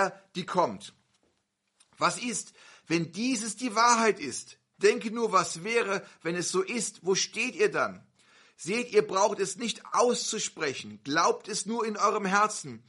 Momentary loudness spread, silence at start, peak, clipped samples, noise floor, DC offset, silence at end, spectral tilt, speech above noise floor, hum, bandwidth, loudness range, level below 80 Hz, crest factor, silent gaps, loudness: 9 LU; 0 s; -8 dBFS; under 0.1%; -77 dBFS; under 0.1%; 0.1 s; -3 dB/octave; 48 dB; none; 11.5 kHz; 3 LU; -78 dBFS; 22 dB; none; -28 LUFS